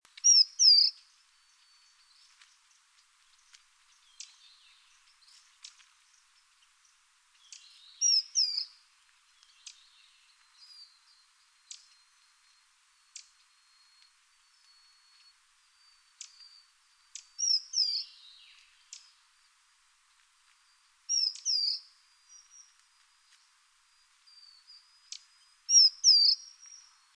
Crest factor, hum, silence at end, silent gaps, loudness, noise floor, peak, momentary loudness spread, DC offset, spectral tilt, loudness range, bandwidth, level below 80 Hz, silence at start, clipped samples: 24 dB; none; 0.8 s; none; -23 LUFS; -67 dBFS; -10 dBFS; 32 LU; under 0.1%; 10 dB/octave; 15 LU; 11 kHz; -90 dBFS; 0.25 s; under 0.1%